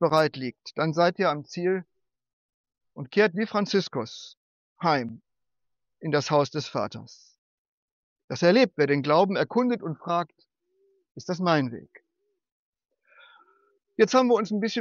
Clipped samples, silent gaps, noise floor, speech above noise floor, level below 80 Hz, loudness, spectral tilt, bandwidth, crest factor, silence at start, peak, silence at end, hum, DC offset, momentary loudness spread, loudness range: under 0.1%; 2.33-2.64 s, 4.37-4.76 s, 7.38-8.16 s, 8.24-8.28 s, 12.52-12.73 s; -86 dBFS; 61 dB; -74 dBFS; -25 LUFS; -4.5 dB/octave; 8 kHz; 18 dB; 0 s; -8 dBFS; 0 s; none; under 0.1%; 16 LU; 6 LU